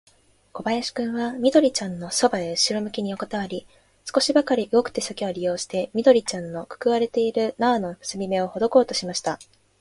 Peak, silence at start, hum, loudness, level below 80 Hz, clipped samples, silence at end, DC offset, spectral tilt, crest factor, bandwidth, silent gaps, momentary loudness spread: -4 dBFS; 0.55 s; none; -23 LUFS; -62 dBFS; under 0.1%; 0.35 s; under 0.1%; -4 dB/octave; 20 dB; 11.5 kHz; none; 11 LU